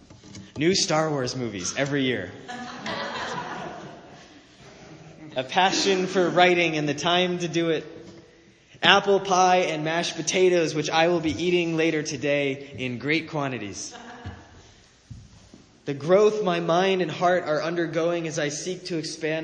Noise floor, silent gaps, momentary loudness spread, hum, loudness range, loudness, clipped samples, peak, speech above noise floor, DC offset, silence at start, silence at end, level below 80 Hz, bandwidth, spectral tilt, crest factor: -54 dBFS; none; 17 LU; none; 9 LU; -23 LUFS; under 0.1%; 0 dBFS; 30 dB; under 0.1%; 0.1 s; 0 s; -60 dBFS; 9.8 kHz; -4 dB/octave; 24 dB